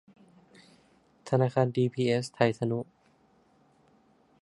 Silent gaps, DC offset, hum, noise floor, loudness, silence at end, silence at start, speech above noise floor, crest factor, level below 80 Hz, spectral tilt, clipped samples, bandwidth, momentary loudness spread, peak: none; under 0.1%; none; -65 dBFS; -28 LUFS; 1.6 s; 1.25 s; 38 dB; 24 dB; -70 dBFS; -7 dB/octave; under 0.1%; 11.5 kHz; 10 LU; -6 dBFS